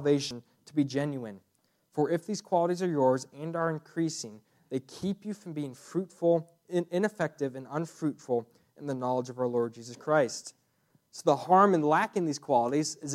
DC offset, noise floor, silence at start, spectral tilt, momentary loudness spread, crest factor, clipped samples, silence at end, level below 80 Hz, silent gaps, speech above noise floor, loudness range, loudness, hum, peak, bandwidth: under 0.1%; -70 dBFS; 0 s; -5.5 dB/octave; 12 LU; 22 dB; under 0.1%; 0 s; -76 dBFS; none; 41 dB; 5 LU; -30 LUFS; none; -8 dBFS; 14.5 kHz